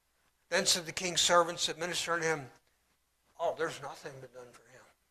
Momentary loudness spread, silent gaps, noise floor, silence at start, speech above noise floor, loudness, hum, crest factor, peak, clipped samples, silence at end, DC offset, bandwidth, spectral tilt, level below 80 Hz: 20 LU; none; -75 dBFS; 0.5 s; 42 dB; -31 LUFS; none; 22 dB; -12 dBFS; under 0.1%; 0.35 s; under 0.1%; 14.5 kHz; -1.5 dB/octave; -70 dBFS